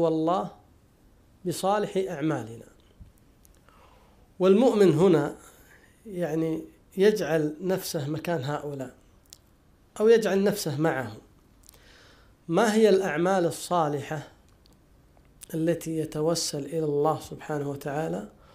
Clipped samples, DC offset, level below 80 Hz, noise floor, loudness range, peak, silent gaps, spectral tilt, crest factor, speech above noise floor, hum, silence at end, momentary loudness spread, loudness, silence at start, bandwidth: under 0.1%; under 0.1%; -60 dBFS; -60 dBFS; 6 LU; -8 dBFS; none; -5.5 dB/octave; 18 dB; 35 dB; none; 0.25 s; 16 LU; -26 LUFS; 0 s; 15.5 kHz